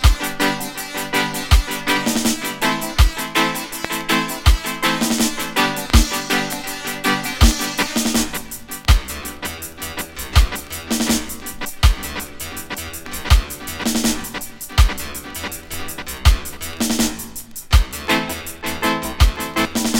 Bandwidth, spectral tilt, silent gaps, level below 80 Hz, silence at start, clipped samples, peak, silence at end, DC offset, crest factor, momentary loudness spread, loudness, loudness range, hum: 17 kHz; -3.5 dB/octave; none; -22 dBFS; 0 s; under 0.1%; 0 dBFS; 0 s; under 0.1%; 18 dB; 11 LU; -20 LUFS; 3 LU; none